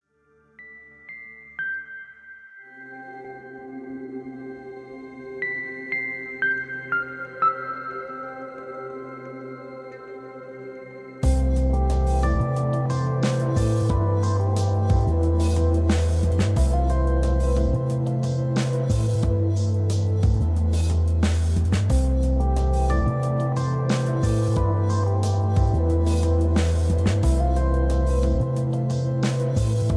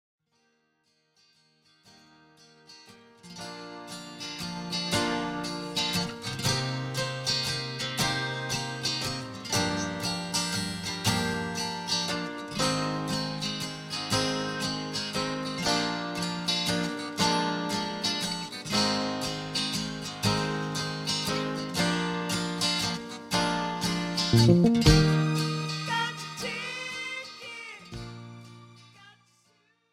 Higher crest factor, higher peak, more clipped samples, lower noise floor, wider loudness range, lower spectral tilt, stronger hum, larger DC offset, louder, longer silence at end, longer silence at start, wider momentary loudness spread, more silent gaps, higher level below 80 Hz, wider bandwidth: second, 14 dB vs 24 dB; about the same, -8 dBFS vs -6 dBFS; neither; second, -61 dBFS vs -72 dBFS; first, 14 LU vs 10 LU; first, -7 dB/octave vs -4 dB/octave; neither; neither; first, -23 LUFS vs -28 LUFS; second, 0 s vs 0.8 s; second, 0.6 s vs 1.85 s; first, 18 LU vs 10 LU; neither; first, -26 dBFS vs -46 dBFS; second, 11 kHz vs 16.5 kHz